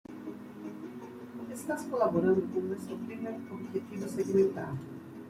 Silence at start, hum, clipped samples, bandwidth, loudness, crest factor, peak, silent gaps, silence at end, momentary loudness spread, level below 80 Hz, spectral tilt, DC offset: 0.1 s; none; under 0.1%; 15 kHz; -33 LUFS; 18 dB; -16 dBFS; none; 0 s; 16 LU; -70 dBFS; -7 dB/octave; under 0.1%